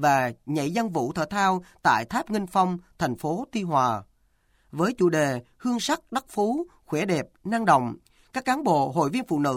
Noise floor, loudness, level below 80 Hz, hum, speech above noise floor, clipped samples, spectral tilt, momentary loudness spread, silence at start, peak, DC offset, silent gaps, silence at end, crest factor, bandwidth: -65 dBFS; -25 LUFS; -60 dBFS; none; 40 dB; under 0.1%; -5.5 dB/octave; 8 LU; 0 s; -6 dBFS; under 0.1%; none; 0 s; 18 dB; 16.5 kHz